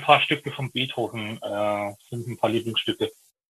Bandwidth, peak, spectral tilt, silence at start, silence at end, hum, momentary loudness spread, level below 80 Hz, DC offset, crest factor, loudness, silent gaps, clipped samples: 13 kHz; -2 dBFS; -5 dB/octave; 0 s; 0.4 s; none; 11 LU; -68 dBFS; under 0.1%; 24 dB; -26 LUFS; none; under 0.1%